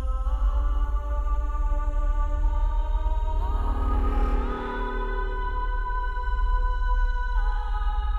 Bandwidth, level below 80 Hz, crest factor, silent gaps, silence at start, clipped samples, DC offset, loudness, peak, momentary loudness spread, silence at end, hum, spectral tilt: 4.3 kHz; -24 dBFS; 10 dB; none; 0 s; under 0.1%; under 0.1%; -29 LUFS; -14 dBFS; 3 LU; 0 s; none; -7.5 dB/octave